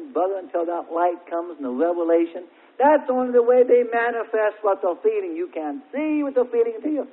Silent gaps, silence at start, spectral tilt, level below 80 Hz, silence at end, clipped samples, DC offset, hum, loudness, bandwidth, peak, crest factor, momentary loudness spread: none; 0 s; -9 dB/octave; -76 dBFS; 0.05 s; under 0.1%; under 0.1%; none; -22 LUFS; 4 kHz; -6 dBFS; 16 dB; 11 LU